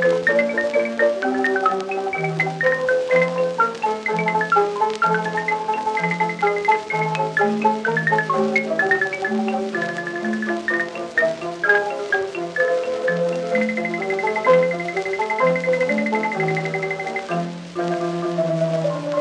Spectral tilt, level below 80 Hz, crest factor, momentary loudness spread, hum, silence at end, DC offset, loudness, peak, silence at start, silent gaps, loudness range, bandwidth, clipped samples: -5.5 dB/octave; -68 dBFS; 18 dB; 6 LU; none; 0 s; under 0.1%; -20 LUFS; -4 dBFS; 0 s; none; 2 LU; 10.5 kHz; under 0.1%